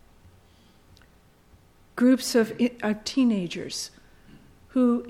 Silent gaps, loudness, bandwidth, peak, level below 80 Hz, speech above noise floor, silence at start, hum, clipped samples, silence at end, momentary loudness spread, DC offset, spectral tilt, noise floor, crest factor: none; -25 LUFS; 16 kHz; -10 dBFS; -60 dBFS; 34 dB; 1.95 s; none; under 0.1%; 0 s; 12 LU; under 0.1%; -4.5 dB/octave; -57 dBFS; 16 dB